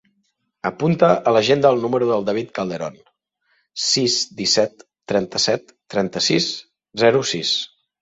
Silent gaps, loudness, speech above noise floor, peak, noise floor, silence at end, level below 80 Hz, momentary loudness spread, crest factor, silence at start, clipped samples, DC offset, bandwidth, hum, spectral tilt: none; -19 LUFS; 51 dB; -2 dBFS; -70 dBFS; 0.35 s; -60 dBFS; 12 LU; 18 dB; 0.65 s; under 0.1%; under 0.1%; 8.2 kHz; none; -3.5 dB/octave